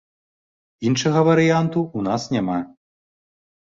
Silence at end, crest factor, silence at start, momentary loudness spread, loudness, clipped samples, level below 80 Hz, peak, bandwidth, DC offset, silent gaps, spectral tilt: 1 s; 18 dB; 0.8 s; 11 LU; -20 LUFS; under 0.1%; -58 dBFS; -4 dBFS; 7.8 kHz; under 0.1%; none; -6 dB/octave